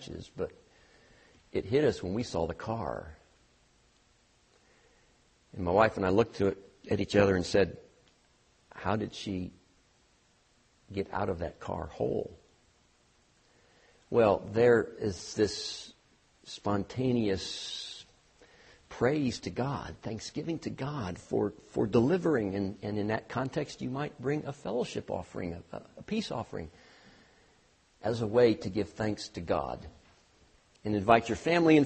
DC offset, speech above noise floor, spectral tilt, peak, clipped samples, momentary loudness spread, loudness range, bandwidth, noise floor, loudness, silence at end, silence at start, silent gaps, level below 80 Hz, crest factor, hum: under 0.1%; 37 dB; -6 dB/octave; -6 dBFS; under 0.1%; 16 LU; 8 LU; 8.4 kHz; -67 dBFS; -31 LUFS; 0 s; 0 s; none; -58 dBFS; 26 dB; none